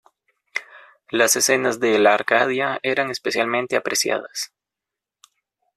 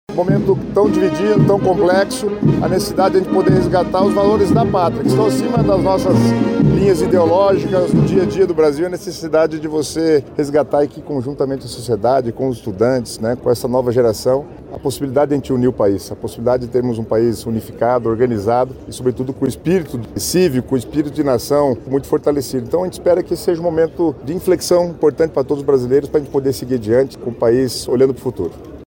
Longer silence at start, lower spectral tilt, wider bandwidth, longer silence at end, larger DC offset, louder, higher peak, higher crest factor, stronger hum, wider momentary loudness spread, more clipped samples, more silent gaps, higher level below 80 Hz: first, 0.55 s vs 0.1 s; second, -2 dB/octave vs -6.5 dB/octave; second, 15 kHz vs 17 kHz; first, 1.3 s vs 0.05 s; neither; second, -20 LUFS vs -16 LUFS; about the same, -2 dBFS vs -4 dBFS; first, 20 dB vs 12 dB; neither; first, 14 LU vs 8 LU; neither; neither; second, -68 dBFS vs -40 dBFS